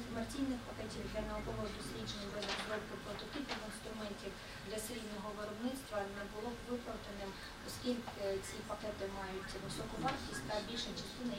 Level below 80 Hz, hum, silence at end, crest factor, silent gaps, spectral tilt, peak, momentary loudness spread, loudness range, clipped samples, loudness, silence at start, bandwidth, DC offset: -56 dBFS; none; 0 s; 20 dB; none; -4 dB/octave; -24 dBFS; 6 LU; 2 LU; under 0.1%; -43 LUFS; 0 s; 16.5 kHz; under 0.1%